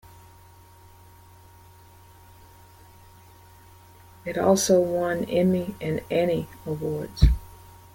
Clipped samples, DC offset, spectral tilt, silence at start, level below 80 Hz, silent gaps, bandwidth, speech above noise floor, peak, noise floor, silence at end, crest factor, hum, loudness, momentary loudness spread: under 0.1%; under 0.1%; -5.5 dB/octave; 4.25 s; -34 dBFS; none; 17 kHz; 28 dB; -4 dBFS; -51 dBFS; 0.45 s; 22 dB; none; -24 LUFS; 12 LU